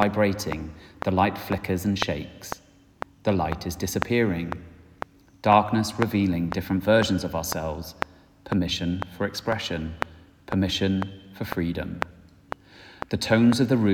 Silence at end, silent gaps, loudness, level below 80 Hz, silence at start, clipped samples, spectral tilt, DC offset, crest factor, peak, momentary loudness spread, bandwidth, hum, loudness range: 0 s; none; -25 LUFS; -48 dBFS; 0 s; under 0.1%; -5.5 dB/octave; under 0.1%; 24 dB; -2 dBFS; 18 LU; 19.5 kHz; none; 5 LU